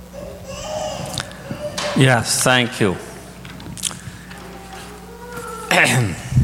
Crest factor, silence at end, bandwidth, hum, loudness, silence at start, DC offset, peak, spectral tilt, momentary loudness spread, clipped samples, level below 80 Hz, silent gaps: 20 dB; 0 s; 17 kHz; none; -18 LUFS; 0 s; under 0.1%; 0 dBFS; -4 dB/octave; 21 LU; under 0.1%; -42 dBFS; none